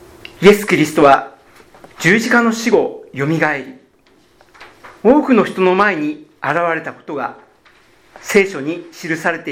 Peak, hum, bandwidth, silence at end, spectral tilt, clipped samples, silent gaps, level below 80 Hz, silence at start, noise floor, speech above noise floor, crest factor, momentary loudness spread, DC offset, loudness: 0 dBFS; none; 17 kHz; 0 s; -5 dB/octave; under 0.1%; none; -50 dBFS; 0.4 s; -52 dBFS; 38 dB; 16 dB; 14 LU; under 0.1%; -15 LUFS